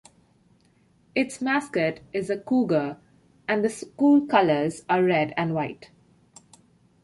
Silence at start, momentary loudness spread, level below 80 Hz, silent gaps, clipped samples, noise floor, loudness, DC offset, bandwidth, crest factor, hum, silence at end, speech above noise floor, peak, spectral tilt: 1.15 s; 12 LU; -66 dBFS; none; under 0.1%; -62 dBFS; -24 LUFS; under 0.1%; 11.5 kHz; 20 dB; none; 1.2 s; 38 dB; -4 dBFS; -6 dB/octave